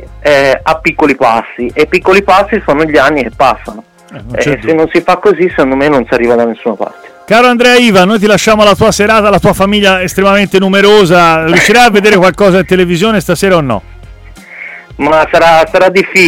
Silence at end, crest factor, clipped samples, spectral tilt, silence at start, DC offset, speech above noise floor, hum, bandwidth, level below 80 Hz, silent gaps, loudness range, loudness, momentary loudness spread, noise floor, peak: 0 s; 8 dB; 0.1%; -4.5 dB/octave; 0 s; under 0.1%; 24 dB; none; 17 kHz; -32 dBFS; none; 4 LU; -7 LUFS; 9 LU; -31 dBFS; 0 dBFS